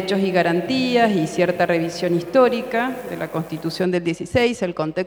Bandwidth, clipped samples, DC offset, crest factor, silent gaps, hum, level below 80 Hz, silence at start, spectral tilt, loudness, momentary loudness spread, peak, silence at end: over 20 kHz; under 0.1%; under 0.1%; 16 dB; none; none; -54 dBFS; 0 s; -6 dB/octave; -20 LUFS; 9 LU; -4 dBFS; 0 s